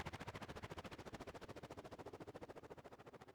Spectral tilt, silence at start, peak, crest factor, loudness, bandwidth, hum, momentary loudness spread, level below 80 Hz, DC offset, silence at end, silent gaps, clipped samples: -5 dB/octave; 0 s; -36 dBFS; 18 dB; -55 LUFS; over 20 kHz; none; 7 LU; -68 dBFS; under 0.1%; 0 s; none; under 0.1%